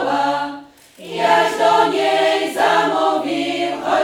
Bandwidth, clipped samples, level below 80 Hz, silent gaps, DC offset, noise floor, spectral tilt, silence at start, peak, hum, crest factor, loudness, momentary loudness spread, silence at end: 17 kHz; under 0.1%; -64 dBFS; none; under 0.1%; -39 dBFS; -3.5 dB/octave; 0 s; -2 dBFS; none; 16 dB; -17 LUFS; 8 LU; 0 s